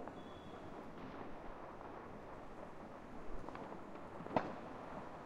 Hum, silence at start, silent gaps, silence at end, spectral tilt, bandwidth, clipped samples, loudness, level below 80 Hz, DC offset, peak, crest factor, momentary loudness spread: none; 0 s; none; 0 s; -7 dB/octave; 12 kHz; under 0.1%; -49 LUFS; -62 dBFS; under 0.1%; -20 dBFS; 28 dB; 11 LU